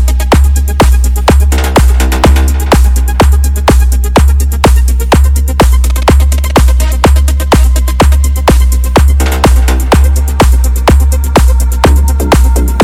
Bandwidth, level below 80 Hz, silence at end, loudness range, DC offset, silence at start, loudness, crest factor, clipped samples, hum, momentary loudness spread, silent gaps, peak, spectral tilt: 16 kHz; -8 dBFS; 0 s; 0 LU; under 0.1%; 0 s; -8 LUFS; 6 dB; 0.4%; none; 1 LU; none; 0 dBFS; -5.5 dB/octave